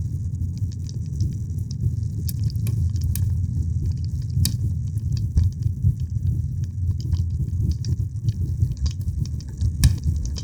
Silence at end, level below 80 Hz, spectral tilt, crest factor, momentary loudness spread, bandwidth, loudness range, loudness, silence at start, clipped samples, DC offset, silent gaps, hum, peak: 0 s; -30 dBFS; -6 dB/octave; 22 dB; 5 LU; over 20 kHz; 1 LU; -25 LUFS; 0 s; under 0.1%; 0.2%; none; none; -2 dBFS